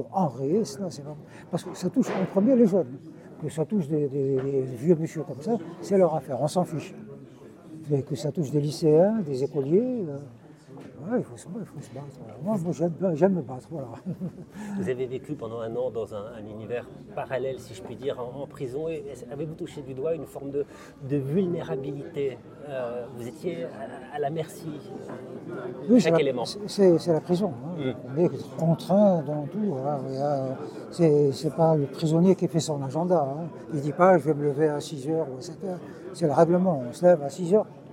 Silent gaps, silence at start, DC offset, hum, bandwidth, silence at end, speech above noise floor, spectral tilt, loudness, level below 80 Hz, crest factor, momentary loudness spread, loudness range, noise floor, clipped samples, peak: none; 0 s; under 0.1%; none; 15.5 kHz; 0 s; 21 dB; -7.5 dB/octave; -26 LUFS; -66 dBFS; 20 dB; 17 LU; 9 LU; -47 dBFS; under 0.1%; -6 dBFS